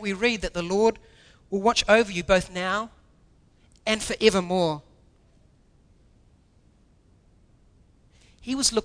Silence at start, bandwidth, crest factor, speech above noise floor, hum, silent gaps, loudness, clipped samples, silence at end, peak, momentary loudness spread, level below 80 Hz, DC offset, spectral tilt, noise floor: 0 s; 11 kHz; 22 dB; 36 dB; none; none; -24 LUFS; under 0.1%; 0 s; -4 dBFS; 12 LU; -48 dBFS; under 0.1%; -3.5 dB/octave; -59 dBFS